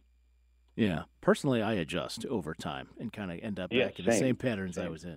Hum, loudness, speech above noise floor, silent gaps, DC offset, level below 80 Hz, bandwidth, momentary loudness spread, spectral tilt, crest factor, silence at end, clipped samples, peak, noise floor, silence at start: none; -32 LUFS; 34 dB; none; under 0.1%; -60 dBFS; 16 kHz; 11 LU; -5.5 dB/octave; 20 dB; 0 s; under 0.1%; -12 dBFS; -66 dBFS; 0.75 s